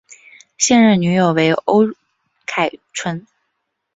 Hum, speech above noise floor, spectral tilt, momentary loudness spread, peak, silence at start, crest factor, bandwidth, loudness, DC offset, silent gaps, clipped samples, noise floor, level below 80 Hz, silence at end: none; 58 dB; -4.5 dB/octave; 14 LU; -2 dBFS; 0.6 s; 16 dB; 7.8 kHz; -16 LUFS; under 0.1%; none; under 0.1%; -73 dBFS; -58 dBFS; 0.75 s